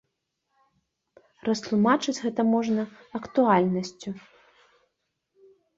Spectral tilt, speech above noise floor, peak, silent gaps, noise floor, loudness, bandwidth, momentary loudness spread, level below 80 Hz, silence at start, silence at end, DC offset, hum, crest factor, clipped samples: -6 dB/octave; 55 dB; -8 dBFS; none; -79 dBFS; -25 LUFS; 7.8 kHz; 16 LU; -68 dBFS; 1.45 s; 1.6 s; under 0.1%; none; 20 dB; under 0.1%